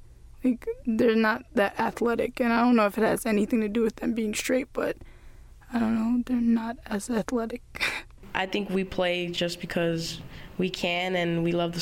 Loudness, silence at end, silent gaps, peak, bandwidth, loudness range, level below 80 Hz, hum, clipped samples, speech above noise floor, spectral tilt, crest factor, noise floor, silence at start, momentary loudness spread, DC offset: -27 LUFS; 0 s; none; -8 dBFS; 17 kHz; 4 LU; -50 dBFS; none; under 0.1%; 21 dB; -5 dB/octave; 18 dB; -48 dBFS; 0 s; 9 LU; under 0.1%